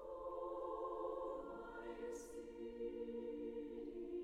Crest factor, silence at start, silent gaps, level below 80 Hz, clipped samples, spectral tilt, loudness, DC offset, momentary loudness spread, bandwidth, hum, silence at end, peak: 14 dB; 0 s; none; -68 dBFS; under 0.1%; -5.5 dB/octave; -48 LUFS; under 0.1%; 6 LU; 14.5 kHz; none; 0 s; -34 dBFS